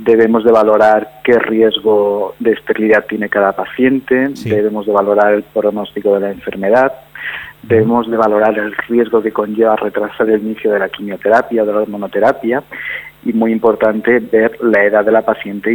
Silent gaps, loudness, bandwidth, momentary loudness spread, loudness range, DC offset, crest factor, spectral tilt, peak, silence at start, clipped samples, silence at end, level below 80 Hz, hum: none; -13 LUFS; 19 kHz; 8 LU; 2 LU; under 0.1%; 12 dB; -7 dB/octave; 0 dBFS; 0 s; under 0.1%; 0 s; -52 dBFS; none